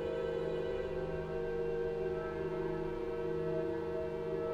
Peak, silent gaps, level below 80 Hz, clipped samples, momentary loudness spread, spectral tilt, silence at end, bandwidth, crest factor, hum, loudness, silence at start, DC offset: -24 dBFS; none; -52 dBFS; under 0.1%; 2 LU; -8 dB/octave; 0 s; 9.6 kHz; 12 dB; none; -38 LUFS; 0 s; under 0.1%